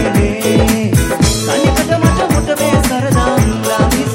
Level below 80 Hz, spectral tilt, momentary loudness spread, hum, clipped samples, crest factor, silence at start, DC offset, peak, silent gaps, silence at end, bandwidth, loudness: -22 dBFS; -5 dB/octave; 2 LU; none; under 0.1%; 12 dB; 0 s; under 0.1%; 0 dBFS; none; 0 s; 16.5 kHz; -13 LUFS